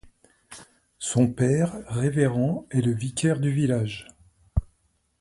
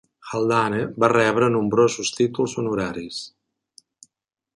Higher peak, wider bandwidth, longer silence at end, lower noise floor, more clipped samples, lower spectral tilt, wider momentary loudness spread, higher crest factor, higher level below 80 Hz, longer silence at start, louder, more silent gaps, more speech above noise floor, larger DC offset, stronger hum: second, -8 dBFS vs -2 dBFS; about the same, 11.5 kHz vs 11.5 kHz; second, 0.55 s vs 1.3 s; about the same, -69 dBFS vs -70 dBFS; neither; first, -6.5 dB/octave vs -5 dB/octave; first, 16 LU vs 13 LU; about the same, 18 dB vs 20 dB; first, -42 dBFS vs -58 dBFS; first, 0.5 s vs 0.25 s; second, -25 LUFS vs -21 LUFS; neither; about the same, 46 dB vs 49 dB; neither; neither